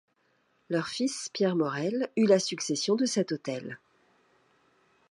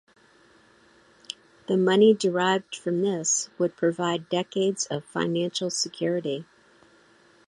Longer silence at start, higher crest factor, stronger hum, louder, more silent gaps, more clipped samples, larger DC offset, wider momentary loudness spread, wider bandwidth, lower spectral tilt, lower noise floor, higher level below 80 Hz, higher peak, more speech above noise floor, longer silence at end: second, 0.7 s vs 1.7 s; about the same, 20 dB vs 18 dB; neither; second, -29 LUFS vs -25 LUFS; neither; neither; neither; about the same, 12 LU vs 12 LU; about the same, 11.5 kHz vs 11.5 kHz; about the same, -4.5 dB/octave vs -4 dB/octave; first, -71 dBFS vs -58 dBFS; second, -80 dBFS vs -72 dBFS; about the same, -10 dBFS vs -8 dBFS; first, 43 dB vs 34 dB; first, 1.35 s vs 1.05 s